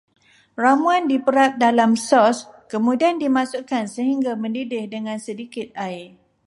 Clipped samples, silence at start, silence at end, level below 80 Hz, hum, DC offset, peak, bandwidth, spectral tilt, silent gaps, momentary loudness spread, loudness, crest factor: under 0.1%; 0.6 s; 0.4 s; -70 dBFS; none; under 0.1%; -4 dBFS; 11.5 kHz; -4.5 dB/octave; none; 14 LU; -20 LUFS; 16 dB